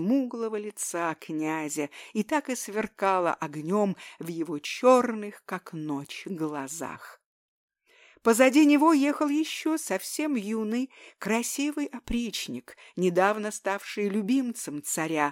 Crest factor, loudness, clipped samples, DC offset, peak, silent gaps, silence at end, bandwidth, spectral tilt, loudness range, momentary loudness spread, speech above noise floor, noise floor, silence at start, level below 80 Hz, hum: 20 dB; -27 LUFS; under 0.1%; under 0.1%; -6 dBFS; 7.26-7.68 s; 0 s; 17 kHz; -4.5 dB/octave; 6 LU; 15 LU; 32 dB; -59 dBFS; 0 s; -58 dBFS; none